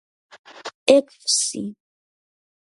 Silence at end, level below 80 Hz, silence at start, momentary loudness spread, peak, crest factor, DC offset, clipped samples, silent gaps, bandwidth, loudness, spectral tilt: 0.9 s; -76 dBFS; 0.55 s; 19 LU; 0 dBFS; 24 dB; under 0.1%; under 0.1%; 0.74-0.86 s; 11.5 kHz; -19 LUFS; -2 dB/octave